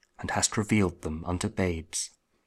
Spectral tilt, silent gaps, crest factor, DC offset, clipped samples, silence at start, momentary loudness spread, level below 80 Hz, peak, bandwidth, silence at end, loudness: -4 dB/octave; none; 18 dB; under 0.1%; under 0.1%; 0.2 s; 7 LU; -48 dBFS; -10 dBFS; 14.5 kHz; 0.4 s; -29 LUFS